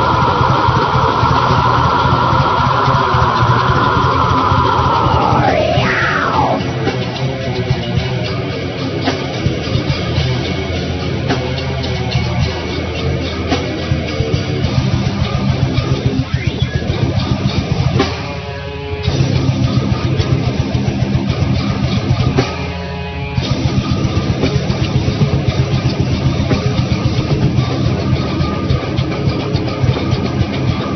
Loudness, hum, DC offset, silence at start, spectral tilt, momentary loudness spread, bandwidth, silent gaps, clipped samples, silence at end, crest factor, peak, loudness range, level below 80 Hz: -15 LUFS; none; under 0.1%; 0 s; -6.5 dB/octave; 6 LU; 6.4 kHz; none; under 0.1%; 0 s; 14 dB; 0 dBFS; 5 LU; -28 dBFS